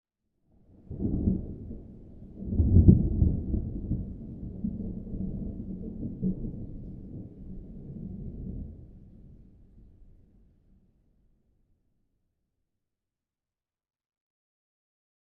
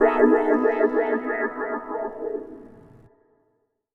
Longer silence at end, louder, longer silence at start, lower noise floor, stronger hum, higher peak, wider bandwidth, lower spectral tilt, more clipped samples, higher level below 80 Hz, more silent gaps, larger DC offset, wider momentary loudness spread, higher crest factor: first, 5.3 s vs 1.15 s; second, -30 LUFS vs -23 LUFS; first, 0.9 s vs 0 s; first, under -90 dBFS vs -71 dBFS; neither; about the same, -4 dBFS vs -4 dBFS; second, 1 kHz vs 4.2 kHz; first, -16.5 dB/octave vs -7.5 dB/octave; neither; first, -38 dBFS vs -60 dBFS; neither; neither; first, 21 LU vs 15 LU; first, 28 dB vs 20 dB